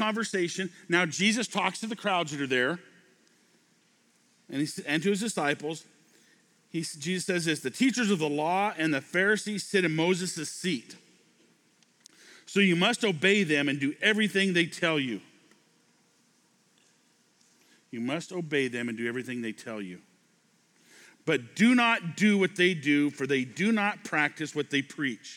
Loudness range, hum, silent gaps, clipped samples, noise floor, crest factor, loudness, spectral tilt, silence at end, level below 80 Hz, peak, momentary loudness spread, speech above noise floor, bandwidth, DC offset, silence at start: 9 LU; none; none; under 0.1%; -67 dBFS; 20 dB; -28 LUFS; -4 dB/octave; 0 s; -86 dBFS; -8 dBFS; 11 LU; 39 dB; 16 kHz; under 0.1%; 0 s